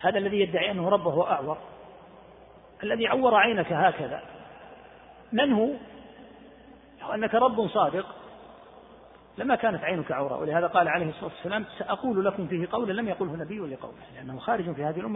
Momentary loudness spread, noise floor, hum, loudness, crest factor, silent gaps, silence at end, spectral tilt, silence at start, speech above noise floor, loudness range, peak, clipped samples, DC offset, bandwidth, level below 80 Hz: 19 LU; -52 dBFS; none; -27 LUFS; 20 dB; none; 0 s; -9.5 dB/octave; 0 s; 25 dB; 4 LU; -8 dBFS; under 0.1%; under 0.1%; 4 kHz; -62 dBFS